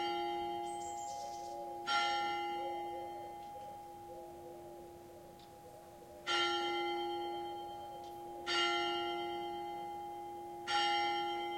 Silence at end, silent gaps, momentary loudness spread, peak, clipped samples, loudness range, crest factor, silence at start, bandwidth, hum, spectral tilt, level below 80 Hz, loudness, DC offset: 0 s; none; 19 LU; -22 dBFS; under 0.1%; 9 LU; 18 dB; 0 s; 16.5 kHz; none; -2.5 dB/octave; -72 dBFS; -38 LUFS; under 0.1%